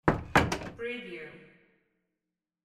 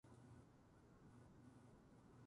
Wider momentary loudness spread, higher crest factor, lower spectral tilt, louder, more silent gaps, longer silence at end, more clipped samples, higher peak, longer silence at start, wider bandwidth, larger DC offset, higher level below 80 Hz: first, 17 LU vs 3 LU; first, 26 dB vs 14 dB; second, -5.5 dB/octave vs -7 dB/octave; first, -30 LUFS vs -67 LUFS; neither; first, 1.2 s vs 0 s; neither; first, -8 dBFS vs -54 dBFS; about the same, 0.05 s vs 0.05 s; first, 16 kHz vs 11 kHz; neither; first, -48 dBFS vs -78 dBFS